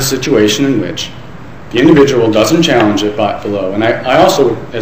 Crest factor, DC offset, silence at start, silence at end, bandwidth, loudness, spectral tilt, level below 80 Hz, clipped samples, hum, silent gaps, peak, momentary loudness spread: 10 dB; 3%; 0 s; 0 s; 16 kHz; -10 LUFS; -5 dB/octave; -40 dBFS; 0.4%; none; none; 0 dBFS; 10 LU